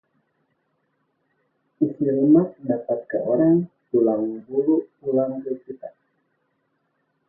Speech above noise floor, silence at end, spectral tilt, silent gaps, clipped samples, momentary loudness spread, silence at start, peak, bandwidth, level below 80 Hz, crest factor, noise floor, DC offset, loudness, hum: 50 dB; 1.4 s; -14.5 dB/octave; none; under 0.1%; 14 LU; 1.8 s; -6 dBFS; 2 kHz; -68 dBFS; 18 dB; -71 dBFS; under 0.1%; -22 LUFS; none